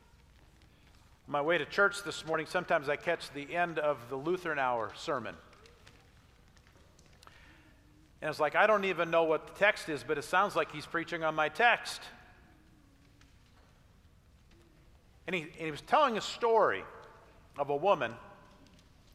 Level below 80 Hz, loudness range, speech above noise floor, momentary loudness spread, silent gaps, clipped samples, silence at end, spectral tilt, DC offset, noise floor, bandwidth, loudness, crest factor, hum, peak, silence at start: -66 dBFS; 12 LU; 30 dB; 13 LU; none; under 0.1%; 0.8 s; -4 dB/octave; under 0.1%; -62 dBFS; 15.5 kHz; -31 LUFS; 24 dB; none; -10 dBFS; 1.3 s